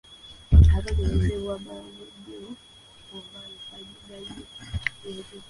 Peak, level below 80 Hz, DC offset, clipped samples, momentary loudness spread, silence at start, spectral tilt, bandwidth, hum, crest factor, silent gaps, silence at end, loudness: -4 dBFS; -28 dBFS; under 0.1%; under 0.1%; 24 LU; 0.5 s; -7 dB/octave; 11 kHz; none; 22 dB; none; 0.1 s; -23 LUFS